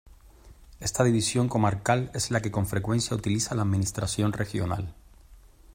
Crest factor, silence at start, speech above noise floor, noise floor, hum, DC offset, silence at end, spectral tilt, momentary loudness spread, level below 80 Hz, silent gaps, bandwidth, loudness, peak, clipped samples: 18 dB; 0.05 s; 26 dB; -52 dBFS; none; under 0.1%; 0.05 s; -5 dB/octave; 7 LU; -50 dBFS; none; 16.5 kHz; -27 LUFS; -8 dBFS; under 0.1%